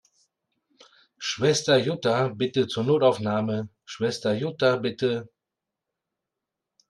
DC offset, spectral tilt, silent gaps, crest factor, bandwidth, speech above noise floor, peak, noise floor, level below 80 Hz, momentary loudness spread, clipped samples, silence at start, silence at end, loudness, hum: under 0.1%; -5 dB/octave; none; 18 dB; 12 kHz; 63 dB; -8 dBFS; -86 dBFS; -68 dBFS; 10 LU; under 0.1%; 1.2 s; 1.6 s; -25 LUFS; none